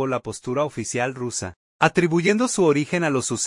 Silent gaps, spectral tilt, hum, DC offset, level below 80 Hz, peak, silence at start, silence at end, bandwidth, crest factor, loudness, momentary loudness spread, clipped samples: 1.56-1.79 s; -4.5 dB/octave; none; under 0.1%; -58 dBFS; -2 dBFS; 0 s; 0 s; 11.5 kHz; 20 dB; -22 LUFS; 9 LU; under 0.1%